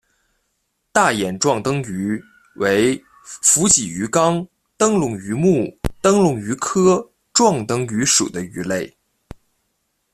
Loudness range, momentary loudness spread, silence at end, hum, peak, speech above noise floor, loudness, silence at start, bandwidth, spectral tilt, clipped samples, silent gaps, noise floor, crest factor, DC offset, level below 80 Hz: 3 LU; 11 LU; 1.25 s; none; 0 dBFS; 53 dB; -18 LUFS; 0.95 s; 14.5 kHz; -3.5 dB/octave; under 0.1%; none; -71 dBFS; 20 dB; under 0.1%; -46 dBFS